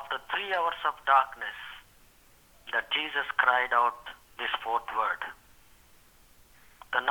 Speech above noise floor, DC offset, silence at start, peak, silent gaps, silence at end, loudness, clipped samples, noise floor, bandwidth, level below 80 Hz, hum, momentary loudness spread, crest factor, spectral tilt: 30 dB; under 0.1%; 0 s; -8 dBFS; none; 0 s; -28 LUFS; under 0.1%; -59 dBFS; over 20 kHz; -64 dBFS; none; 19 LU; 24 dB; -1.5 dB/octave